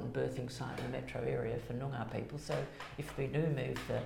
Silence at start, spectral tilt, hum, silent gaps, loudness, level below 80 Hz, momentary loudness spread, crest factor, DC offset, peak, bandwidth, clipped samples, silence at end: 0 s; -6.5 dB/octave; none; none; -39 LUFS; -58 dBFS; 6 LU; 16 dB; under 0.1%; -22 dBFS; 16.5 kHz; under 0.1%; 0 s